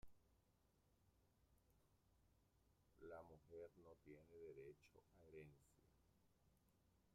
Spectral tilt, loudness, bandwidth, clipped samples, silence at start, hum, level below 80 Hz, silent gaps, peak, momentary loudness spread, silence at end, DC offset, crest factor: -6.5 dB/octave; -64 LUFS; 11.5 kHz; under 0.1%; 0 s; none; -82 dBFS; none; -48 dBFS; 6 LU; 0 s; under 0.1%; 20 dB